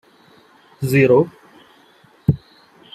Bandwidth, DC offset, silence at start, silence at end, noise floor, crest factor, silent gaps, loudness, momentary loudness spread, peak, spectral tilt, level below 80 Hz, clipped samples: 14.5 kHz; under 0.1%; 0.8 s; 0.6 s; -52 dBFS; 18 dB; none; -18 LUFS; 14 LU; -2 dBFS; -7.5 dB/octave; -50 dBFS; under 0.1%